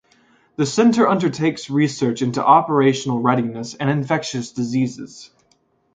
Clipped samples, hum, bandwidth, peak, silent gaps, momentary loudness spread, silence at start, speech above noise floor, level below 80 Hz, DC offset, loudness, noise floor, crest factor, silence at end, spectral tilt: under 0.1%; none; 9.4 kHz; 0 dBFS; none; 11 LU; 0.6 s; 44 dB; -62 dBFS; under 0.1%; -19 LUFS; -62 dBFS; 18 dB; 0.7 s; -6 dB/octave